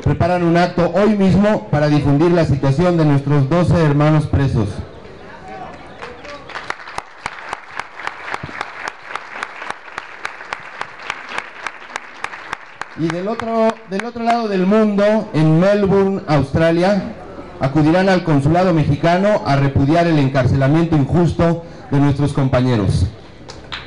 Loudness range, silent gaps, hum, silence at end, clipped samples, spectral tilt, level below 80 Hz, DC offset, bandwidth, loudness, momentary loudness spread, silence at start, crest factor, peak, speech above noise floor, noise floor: 13 LU; none; none; 0 s; under 0.1%; -7.5 dB/octave; -38 dBFS; 0.7%; 10.5 kHz; -16 LUFS; 16 LU; 0 s; 8 dB; -8 dBFS; 22 dB; -36 dBFS